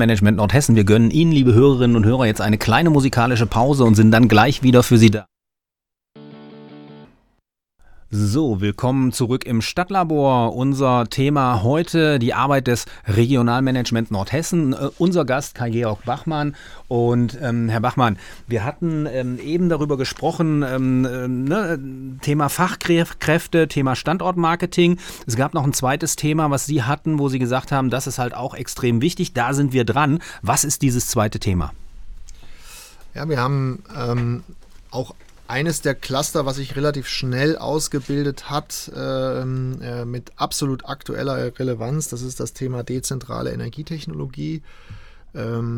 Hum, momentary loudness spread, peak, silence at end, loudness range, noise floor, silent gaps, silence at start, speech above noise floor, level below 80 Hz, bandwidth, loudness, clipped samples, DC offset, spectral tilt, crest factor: none; 13 LU; 0 dBFS; 0 s; 10 LU; -86 dBFS; none; 0 s; 67 dB; -40 dBFS; 18.5 kHz; -19 LUFS; under 0.1%; under 0.1%; -5.5 dB/octave; 20 dB